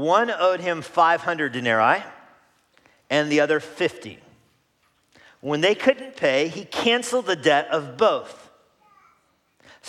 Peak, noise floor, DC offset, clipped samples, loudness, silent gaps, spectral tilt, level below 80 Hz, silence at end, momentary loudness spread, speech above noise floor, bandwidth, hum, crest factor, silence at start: -4 dBFS; -66 dBFS; under 0.1%; under 0.1%; -21 LUFS; none; -4 dB/octave; -74 dBFS; 0 s; 9 LU; 44 dB; 14 kHz; none; 20 dB; 0 s